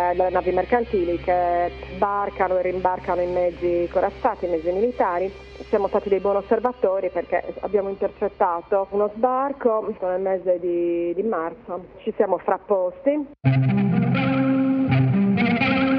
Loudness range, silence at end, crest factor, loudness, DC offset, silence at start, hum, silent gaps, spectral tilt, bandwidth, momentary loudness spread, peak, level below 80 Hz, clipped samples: 3 LU; 0 s; 16 dB; -22 LUFS; under 0.1%; 0 s; none; none; -9.5 dB/octave; 5.6 kHz; 6 LU; -6 dBFS; -48 dBFS; under 0.1%